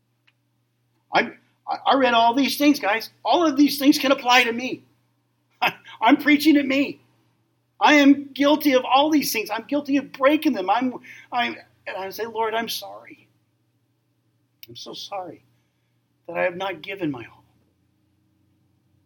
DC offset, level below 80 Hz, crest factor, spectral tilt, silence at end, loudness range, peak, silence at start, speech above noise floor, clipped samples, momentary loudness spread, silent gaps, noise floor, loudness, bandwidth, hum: under 0.1%; -78 dBFS; 20 dB; -3 dB/octave; 1.8 s; 13 LU; -2 dBFS; 1.1 s; 49 dB; under 0.1%; 16 LU; none; -69 dBFS; -20 LUFS; 17.5 kHz; none